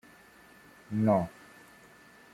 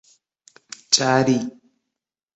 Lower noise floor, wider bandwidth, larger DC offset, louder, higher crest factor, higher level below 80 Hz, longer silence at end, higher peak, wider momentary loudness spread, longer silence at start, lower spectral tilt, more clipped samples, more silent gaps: second, -57 dBFS vs -84 dBFS; first, 14.5 kHz vs 8.2 kHz; neither; second, -30 LUFS vs -19 LUFS; about the same, 22 dB vs 24 dB; about the same, -66 dBFS vs -64 dBFS; first, 1.05 s vs 0.85 s; second, -12 dBFS vs 0 dBFS; about the same, 26 LU vs 24 LU; about the same, 0.9 s vs 0.9 s; first, -8.5 dB/octave vs -3.5 dB/octave; neither; neither